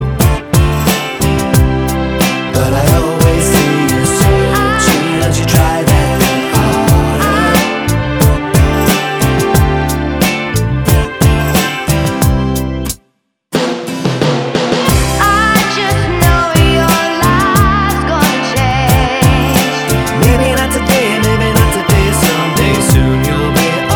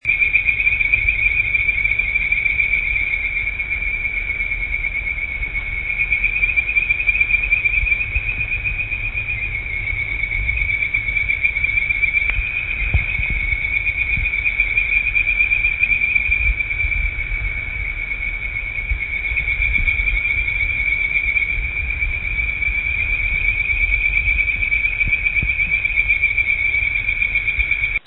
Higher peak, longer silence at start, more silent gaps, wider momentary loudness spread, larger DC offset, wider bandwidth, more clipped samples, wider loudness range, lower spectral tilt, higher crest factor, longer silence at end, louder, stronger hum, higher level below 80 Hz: about the same, 0 dBFS vs -2 dBFS; about the same, 0 s vs 0.05 s; neither; second, 4 LU vs 7 LU; second, under 0.1% vs 0.3%; first, over 20 kHz vs 4.1 kHz; neither; about the same, 3 LU vs 4 LU; second, -5 dB/octave vs -7.5 dB/octave; second, 10 dB vs 16 dB; about the same, 0 s vs 0.1 s; first, -11 LUFS vs -17 LUFS; neither; first, -20 dBFS vs -28 dBFS